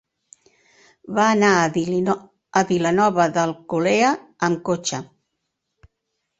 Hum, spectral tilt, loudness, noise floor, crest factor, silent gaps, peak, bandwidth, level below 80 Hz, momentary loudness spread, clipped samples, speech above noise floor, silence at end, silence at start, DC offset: none; -5 dB/octave; -20 LUFS; -77 dBFS; 18 dB; none; -2 dBFS; 8.2 kHz; -60 dBFS; 8 LU; under 0.1%; 58 dB; 1.35 s; 1.05 s; under 0.1%